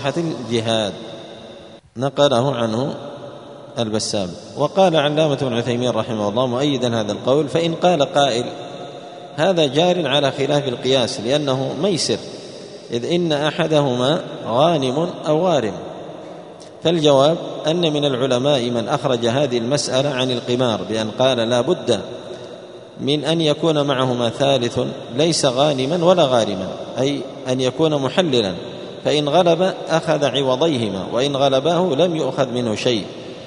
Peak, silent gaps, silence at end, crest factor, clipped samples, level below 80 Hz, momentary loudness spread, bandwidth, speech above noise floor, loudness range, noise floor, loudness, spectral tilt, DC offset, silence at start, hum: 0 dBFS; none; 0 s; 18 dB; under 0.1%; -58 dBFS; 16 LU; 11 kHz; 22 dB; 2 LU; -40 dBFS; -18 LUFS; -5 dB/octave; under 0.1%; 0 s; none